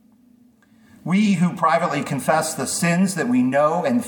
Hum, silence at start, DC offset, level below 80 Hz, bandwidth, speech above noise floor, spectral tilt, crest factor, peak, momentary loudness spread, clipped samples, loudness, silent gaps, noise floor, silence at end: none; 1.05 s; under 0.1%; -66 dBFS; 19 kHz; 35 dB; -5.5 dB/octave; 16 dB; -4 dBFS; 5 LU; under 0.1%; -20 LUFS; none; -54 dBFS; 0 s